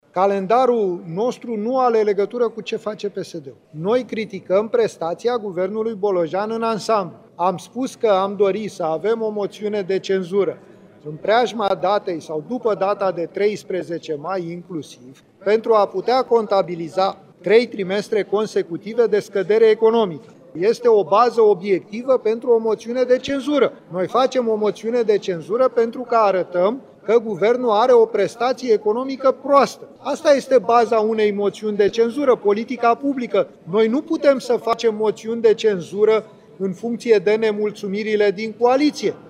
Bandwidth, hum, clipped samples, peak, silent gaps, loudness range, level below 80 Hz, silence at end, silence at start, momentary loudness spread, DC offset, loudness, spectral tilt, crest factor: 11 kHz; none; under 0.1%; -2 dBFS; none; 4 LU; -68 dBFS; 0.1 s; 0.15 s; 10 LU; under 0.1%; -19 LUFS; -5.5 dB/octave; 16 dB